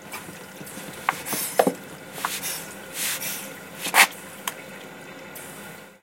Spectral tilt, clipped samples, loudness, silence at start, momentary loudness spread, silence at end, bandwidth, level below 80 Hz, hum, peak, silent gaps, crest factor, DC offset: -1.5 dB/octave; under 0.1%; -24 LUFS; 0 s; 20 LU; 0.05 s; 17 kHz; -70 dBFS; none; 0 dBFS; none; 28 dB; under 0.1%